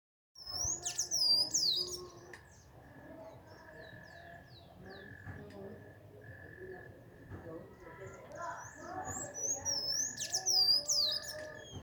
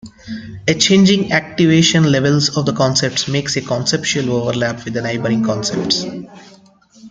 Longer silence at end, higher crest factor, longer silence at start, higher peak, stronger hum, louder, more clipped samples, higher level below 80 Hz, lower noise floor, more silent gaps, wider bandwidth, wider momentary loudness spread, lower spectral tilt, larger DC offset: about the same, 0 s vs 0 s; about the same, 20 dB vs 16 dB; first, 0.35 s vs 0.05 s; second, -20 dBFS vs 0 dBFS; neither; second, -32 LUFS vs -15 LUFS; neither; second, -66 dBFS vs -50 dBFS; first, -58 dBFS vs -47 dBFS; neither; first, over 20 kHz vs 9.6 kHz; first, 26 LU vs 10 LU; second, -0.5 dB/octave vs -4.5 dB/octave; neither